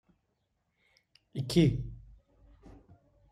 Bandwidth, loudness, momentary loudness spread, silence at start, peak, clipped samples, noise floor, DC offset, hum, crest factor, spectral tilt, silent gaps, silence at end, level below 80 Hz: 14.5 kHz; -30 LUFS; 20 LU; 1.35 s; -12 dBFS; under 0.1%; -79 dBFS; under 0.1%; none; 24 dB; -7 dB/octave; none; 1.35 s; -52 dBFS